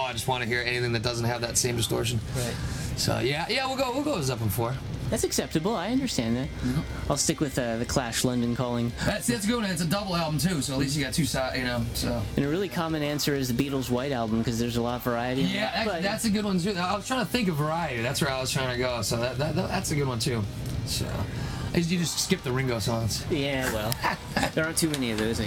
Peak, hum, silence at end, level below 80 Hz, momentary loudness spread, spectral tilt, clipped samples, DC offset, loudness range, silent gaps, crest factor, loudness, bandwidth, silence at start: -4 dBFS; none; 0 s; -44 dBFS; 4 LU; -4.5 dB/octave; under 0.1%; under 0.1%; 1 LU; none; 22 dB; -27 LUFS; 18.5 kHz; 0 s